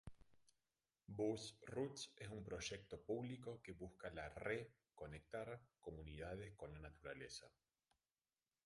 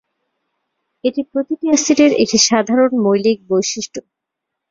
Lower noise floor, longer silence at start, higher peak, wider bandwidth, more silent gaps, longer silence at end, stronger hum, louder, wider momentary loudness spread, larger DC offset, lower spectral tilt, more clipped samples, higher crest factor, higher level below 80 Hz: first, under -90 dBFS vs -80 dBFS; second, 0.05 s vs 1.05 s; second, -30 dBFS vs 0 dBFS; first, 11.5 kHz vs 7.6 kHz; neither; first, 1.15 s vs 0.7 s; neither; second, -52 LUFS vs -15 LUFS; about the same, 10 LU vs 10 LU; neither; first, -5 dB/octave vs -3 dB/octave; neither; first, 22 dB vs 16 dB; second, -68 dBFS vs -58 dBFS